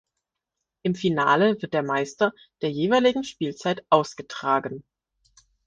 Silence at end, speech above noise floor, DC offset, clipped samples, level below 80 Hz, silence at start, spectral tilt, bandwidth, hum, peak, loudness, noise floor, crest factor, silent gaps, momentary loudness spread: 0.85 s; 60 dB; under 0.1%; under 0.1%; -66 dBFS; 0.85 s; -5.5 dB/octave; 9.6 kHz; none; -4 dBFS; -24 LUFS; -84 dBFS; 22 dB; none; 11 LU